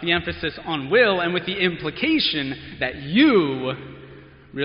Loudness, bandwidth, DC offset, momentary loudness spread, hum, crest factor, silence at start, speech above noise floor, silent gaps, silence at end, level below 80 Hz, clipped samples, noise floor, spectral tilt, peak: -21 LUFS; 5.4 kHz; under 0.1%; 13 LU; none; 18 dB; 0 s; 23 dB; none; 0 s; -50 dBFS; under 0.1%; -45 dBFS; -3 dB/octave; -4 dBFS